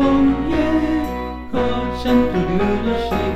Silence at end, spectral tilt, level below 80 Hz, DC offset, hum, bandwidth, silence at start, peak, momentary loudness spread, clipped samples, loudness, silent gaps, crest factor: 0 s; -7.5 dB/octave; -30 dBFS; under 0.1%; none; 13 kHz; 0 s; -4 dBFS; 6 LU; under 0.1%; -19 LUFS; none; 14 dB